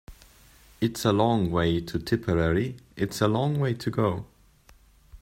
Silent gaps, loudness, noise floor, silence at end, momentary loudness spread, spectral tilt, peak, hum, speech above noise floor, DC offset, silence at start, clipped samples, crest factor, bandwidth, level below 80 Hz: none; -26 LUFS; -57 dBFS; 0.05 s; 7 LU; -6.5 dB/octave; -8 dBFS; none; 32 dB; under 0.1%; 0.1 s; under 0.1%; 18 dB; 16 kHz; -48 dBFS